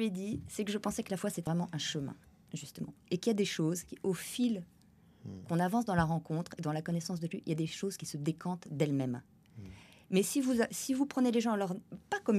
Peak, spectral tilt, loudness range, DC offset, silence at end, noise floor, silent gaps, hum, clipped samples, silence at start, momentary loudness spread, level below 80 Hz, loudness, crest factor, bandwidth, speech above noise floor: -16 dBFS; -5.5 dB/octave; 3 LU; under 0.1%; 0 s; -62 dBFS; none; none; under 0.1%; 0 s; 14 LU; -64 dBFS; -35 LUFS; 20 dB; 14.5 kHz; 28 dB